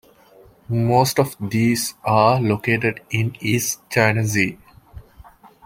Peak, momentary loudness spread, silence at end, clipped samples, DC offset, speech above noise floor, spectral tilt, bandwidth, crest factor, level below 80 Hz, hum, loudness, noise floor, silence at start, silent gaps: -2 dBFS; 6 LU; 0.45 s; under 0.1%; under 0.1%; 31 dB; -5 dB/octave; 16.5 kHz; 18 dB; -52 dBFS; none; -19 LUFS; -50 dBFS; 0.7 s; none